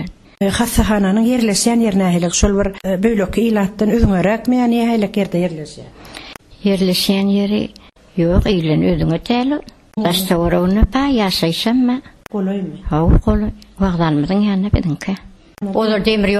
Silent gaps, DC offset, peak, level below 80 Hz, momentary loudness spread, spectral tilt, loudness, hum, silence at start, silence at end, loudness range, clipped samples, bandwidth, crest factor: none; under 0.1%; -2 dBFS; -26 dBFS; 11 LU; -5.5 dB/octave; -16 LUFS; none; 0 s; 0 s; 2 LU; under 0.1%; 14 kHz; 14 dB